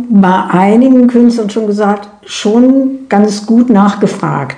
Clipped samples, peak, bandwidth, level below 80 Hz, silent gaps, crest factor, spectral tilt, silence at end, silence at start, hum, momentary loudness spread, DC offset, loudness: 2%; 0 dBFS; 10 kHz; -52 dBFS; none; 8 dB; -6.5 dB/octave; 0 s; 0 s; none; 8 LU; under 0.1%; -9 LUFS